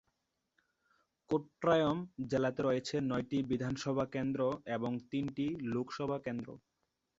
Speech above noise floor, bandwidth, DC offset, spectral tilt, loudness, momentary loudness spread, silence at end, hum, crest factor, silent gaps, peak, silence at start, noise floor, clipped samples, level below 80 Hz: 48 dB; 8 kHz; under 0.1%; -6 dB/octave; -36 LUFS; 7 LU; 0.6 s; none; 18 dB; none; -18 dBFS; 1.3 s; -83 dBFS; under 0.1%; -66 dBFS